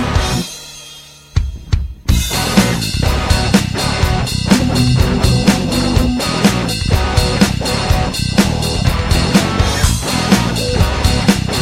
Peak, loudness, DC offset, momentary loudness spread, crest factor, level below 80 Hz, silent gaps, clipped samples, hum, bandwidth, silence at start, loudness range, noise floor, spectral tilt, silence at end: 0 dBFS; -14 LUFS; under 0.1%; 8 LU; 14 dB; -20 dBFS; none; under 0.1%; none; 16 kHz; 0 s; 2 LU; -37 dBFS; -4.5 dB/octave; 0 s